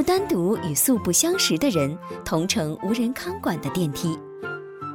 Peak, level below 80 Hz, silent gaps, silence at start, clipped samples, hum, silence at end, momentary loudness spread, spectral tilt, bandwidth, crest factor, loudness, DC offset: -6 dBFS; -52 dBFS; none; 0 s; under 0.1%; none; 0 s; 14 LU; -4 dB/octave; over 20 kHz; 16 dB; -23 LUFS; under 0.1%